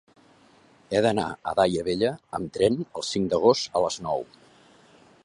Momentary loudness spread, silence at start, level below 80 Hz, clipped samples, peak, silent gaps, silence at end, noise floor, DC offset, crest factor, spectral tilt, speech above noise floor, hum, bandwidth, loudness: 10 LU; 0.9 s; -56 dBFS; under 0.1%; -6 dBFS; none; 1 s; -57 dBFS; under 0.1%; 20 dB; -5 dB/octave; 32 dB; none; 11 kHz; -25 LUFS